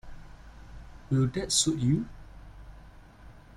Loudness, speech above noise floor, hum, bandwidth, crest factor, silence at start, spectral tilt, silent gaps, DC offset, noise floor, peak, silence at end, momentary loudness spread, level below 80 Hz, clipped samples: -27 LUFS; 24 dB; none; 15 kHz; 20 dB; 0.05 s; -4.5 dB/octave; none; under 0.1%; -51 dBFS; -12 dBFS; 0.15 s; 26 LU; -48 dBFS; under 0.1%